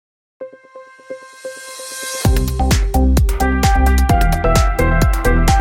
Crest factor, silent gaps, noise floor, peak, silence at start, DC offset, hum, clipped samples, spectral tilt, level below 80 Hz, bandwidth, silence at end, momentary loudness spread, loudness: 14 dB; none; -40 dBFS; 0 dBFS; 0.4 s; under 0.1%; none; under 0.1%; -5.5 dB/octave; -18 dBFS; 17 kHz; 0 s; 20 LU; -15 LUFS